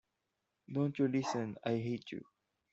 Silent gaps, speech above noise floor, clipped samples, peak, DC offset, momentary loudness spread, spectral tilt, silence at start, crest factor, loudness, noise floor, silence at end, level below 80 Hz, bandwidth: none; 50 dB; under 0.1%; -20 dBFS; under 0.1%; 11 LU; -7 dB/octave; 0.7 s; 18 dB; -37 LUFS; -86 dBFS; 0.5 s; -78 dBFS; 8 kHz